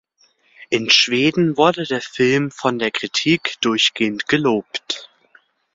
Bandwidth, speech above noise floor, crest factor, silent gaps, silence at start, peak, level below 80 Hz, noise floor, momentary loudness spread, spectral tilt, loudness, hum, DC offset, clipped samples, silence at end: 7.8 kHz; 41 dB; 18 dB; none; 0.6 s; 0 dBFS; -60 dBFS; -59 dBFS; 10 LU; -4 dB/octave; -18 LUFS; none; under 0.1%; under 0.1%; 0.7 s